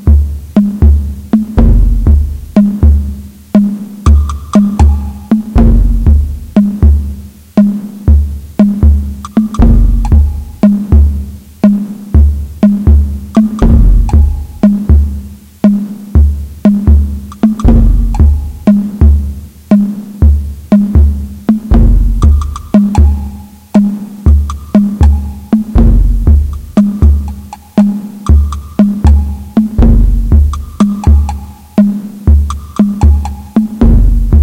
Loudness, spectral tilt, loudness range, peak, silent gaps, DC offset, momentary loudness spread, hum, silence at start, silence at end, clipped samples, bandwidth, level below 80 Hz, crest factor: -10 LUFS; -9.5 dB/octave; 1 LU; 0 dBFS; none; under 0.1%; 7 LU; none; 0 s; 0 s; 2%; 8.6 kHz; -10 dBFS; 8 dB